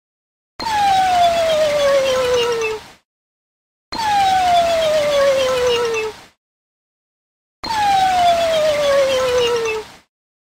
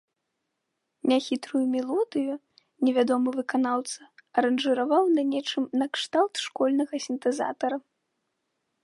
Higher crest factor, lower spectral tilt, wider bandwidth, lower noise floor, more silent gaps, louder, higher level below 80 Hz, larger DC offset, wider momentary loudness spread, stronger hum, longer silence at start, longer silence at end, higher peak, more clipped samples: about the same, 14 dB vs 18 dB; second, -2 dB/octave vs -3.5 dB/octave; first, 16 kHz vs 11.5 kHz; first, under -90 dBFS vs -81 dBFS; first, 3.05-3.92 s, 6.37-7.63 s vs none; first, -16 LUFS vs -26 LUFS; first, -46 dBFS vs -82 dBFS; neither; about the same, 9 LU vs 8 LU; neither; second, 0.6 s vs 1.05 s; second, 0.6 s vs 1.05 s; first, -4 dBFS vs -8 dBFS; neither